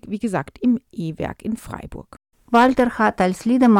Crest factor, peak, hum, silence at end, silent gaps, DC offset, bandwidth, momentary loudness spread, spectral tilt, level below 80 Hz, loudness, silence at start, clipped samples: 14 dB; -6 dBFS; none; 0 s; none; under 0.1%; 14 kHz; 18 LU; -6.5 dB/octave; -46 dBFS; -20 LUFS; 0.05 s; under 0.1%